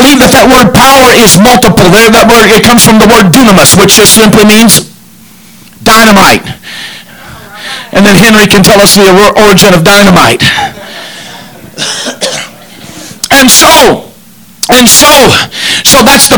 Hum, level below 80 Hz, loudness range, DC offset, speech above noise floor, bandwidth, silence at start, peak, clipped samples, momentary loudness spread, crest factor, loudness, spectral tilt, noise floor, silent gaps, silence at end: none; -26 dBFS; 6 LU; under 0.1%; 32 dB; over 20 kHz; 0 s; 0 dBFS; 40%; 17 LU; 4 dB; -1 LUFS; -3 dB/octave; -34 dBFS; none; 0 s